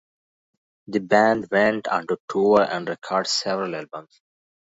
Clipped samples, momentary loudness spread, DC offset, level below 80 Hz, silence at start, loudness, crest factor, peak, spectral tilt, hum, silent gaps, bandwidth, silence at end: under 0.1%; 11 LU; under 0.1%; -64 dBFS; 0.9 s; -22 LUFS; 20 dB; -2 dBFS; -4 dB/octave; none; 2.20-2.28 s; 8 kHz; 0.7 s